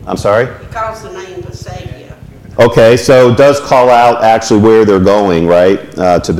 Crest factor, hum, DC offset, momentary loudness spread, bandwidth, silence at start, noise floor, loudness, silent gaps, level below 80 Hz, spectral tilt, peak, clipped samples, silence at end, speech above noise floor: 8 dB; none; under 0.1%; 20 LU; 16 kHz; 0 s; -31 dBFS; -8 LUFS; none; -36 dBFS; -6 dB/octave; 0 dBFS; under 0.1%; 0 s; 23 dB